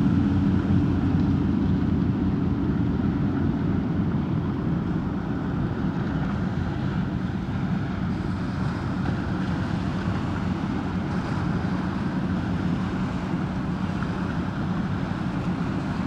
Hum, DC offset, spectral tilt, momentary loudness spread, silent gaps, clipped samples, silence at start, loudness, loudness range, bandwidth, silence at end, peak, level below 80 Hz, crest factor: none; under 0.1%; -8.5 dB/octave; 5 LU; none; under 0.1%; 0 s; -26 LUFS; 4 LU; 8.6 kHz; 0 s; -10 dBFS; -38 dBFS; 14 dB